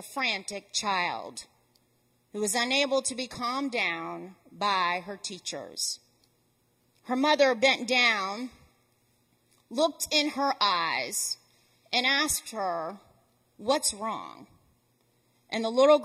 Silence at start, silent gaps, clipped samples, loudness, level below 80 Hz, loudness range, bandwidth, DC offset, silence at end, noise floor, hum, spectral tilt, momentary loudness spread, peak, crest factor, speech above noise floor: 0 s; none; under 0.1%; -27 LUFS; -66 dBFS; 5 LU; 16 kHz; under 0.1%; 0 s; -70 dBFS; none; -1.5 dB/octave; 15 LU; -8 dBFS; 22 dB; 42 dB